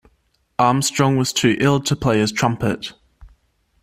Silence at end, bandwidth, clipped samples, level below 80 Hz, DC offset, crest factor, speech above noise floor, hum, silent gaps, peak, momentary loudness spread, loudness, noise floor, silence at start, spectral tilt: 0.55 s; 15.5 kHz; under 0.1%; -48 dBFS; under 0.1%; 18 dB; 46 dB; none; none; -2 dBFS; 9 LU; -18 LUFS; -64 dBFS; 0.6 s; -4.5 dB/octave